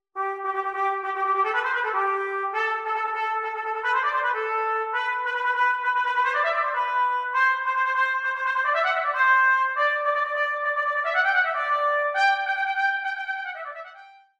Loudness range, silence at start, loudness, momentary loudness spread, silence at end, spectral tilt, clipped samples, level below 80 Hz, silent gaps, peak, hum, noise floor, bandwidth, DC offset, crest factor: 4 LU; 0.15 s; -23 LUFS; 6 LU; 0.3 s; 0 dB/octave; under 0.1%; -76 dBFS; none; -10 dBFS; none; -48 dBFS; 10 kHz; under 0.1%; 14 dB